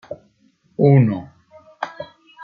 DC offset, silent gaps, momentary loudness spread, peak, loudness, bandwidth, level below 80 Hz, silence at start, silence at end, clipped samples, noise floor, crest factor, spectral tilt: under 0.1%; none; 24 LU; -2 dBFS; -17 LUFS; 5 kHz; -60 dBFS; 0.1 s; 0 s; under 0.1%; -59 dBFS; 18 dB; -10.5 dB/octave